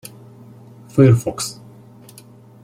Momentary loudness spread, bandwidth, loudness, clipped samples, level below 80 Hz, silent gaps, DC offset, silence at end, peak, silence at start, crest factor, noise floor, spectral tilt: 26 LU; 15.5 kHz; -17 LUFS; under 0.1%; -52 dBFS; none; under 0.1%; 1.1 s; -2 dBFS; 0.95 s; 18 dB; -44 dBFS; -6.5 dB/octave